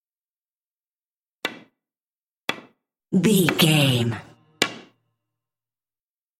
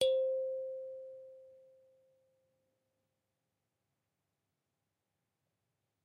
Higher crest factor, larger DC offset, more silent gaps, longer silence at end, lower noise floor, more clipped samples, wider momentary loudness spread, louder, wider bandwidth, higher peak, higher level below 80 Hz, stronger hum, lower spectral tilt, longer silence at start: about the same, 24 dB vs 24 dB; neither; first, 2.03-2.10 s, 2.21-2.30 s, 2.37-2.47 s vs none; second, 1.6 s vs 4.45 s; about the same, under -90 dBFS vs -87 dBFS; neither; second, 15 LU vs 23 LU; first, -22 LUFS vs -38 LUFS; first, 16.5 kHz vs 9.6 kHz; first, 0 dBFS vs -18 dBFS; first, -66 dBFS vs -86 dBFS; neither; first, -4.5 dB/octave vs -2 dB/octave; first, 1.45 s vs 0 s